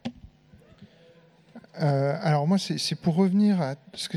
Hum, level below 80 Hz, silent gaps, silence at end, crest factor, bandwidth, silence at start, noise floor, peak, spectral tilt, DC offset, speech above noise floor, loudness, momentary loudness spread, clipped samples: none; -64 dBFS; none; 0 s; 16 dB; 13 kHz; 0.05 s; -56 dBFS; -10 dBFS; -6.5 dB/octave; under 0.1%; 32 dB; -25 LUFS; 12 LU; under 0.1%